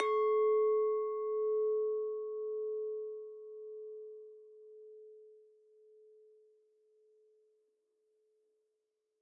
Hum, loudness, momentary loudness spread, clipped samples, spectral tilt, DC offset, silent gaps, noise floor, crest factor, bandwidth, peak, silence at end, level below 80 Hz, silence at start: none; -34 LUFS; 25 LU; under 0.1%; 1 dB/octave; under 0.1%; none; -85 dBFS; 20 dB; 3.9 kHz; -18 dBFS; 3.85 s; under -90 dBFS; 0 s